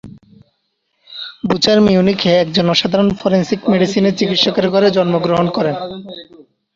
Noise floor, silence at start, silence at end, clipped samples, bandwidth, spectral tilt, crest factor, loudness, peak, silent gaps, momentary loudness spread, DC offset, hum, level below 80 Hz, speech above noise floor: -67 dBFS; 0.05 s; 0.5 s; under 0.1%; 7.6 kHz; -6 dB/octave; 14 dB; -14 LUFS; 0 dBFS; none; 17 LU; under 0.1%; none; -48 dBFS; 54 dB